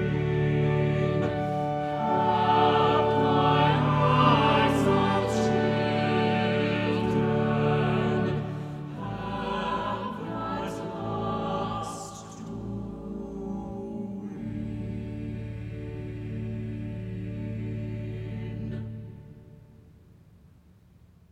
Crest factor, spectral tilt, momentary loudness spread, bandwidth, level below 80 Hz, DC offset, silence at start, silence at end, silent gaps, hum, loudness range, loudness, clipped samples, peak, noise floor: 18 dB; -7 dB/octave; 15 LU; 11.5 kHz; -48 dBFS; under 0.1%; 0 s; 1.7 s; none; none; 14 LU; -27 LUFS; under 0.1%; -10 dBFS; -56 dBFS